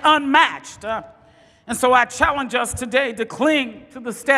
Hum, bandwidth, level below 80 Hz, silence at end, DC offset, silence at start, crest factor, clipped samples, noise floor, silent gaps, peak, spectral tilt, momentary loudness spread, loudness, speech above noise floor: none; 15.5 kHz; -48 dBFS; 0 s; under 0.1%; 0 s; 20 dB; under 0.1%; -52 dBFS; none; 0 dBFS; -2.5 dB/octave; 14 LU; -19 LUFS; 33 dB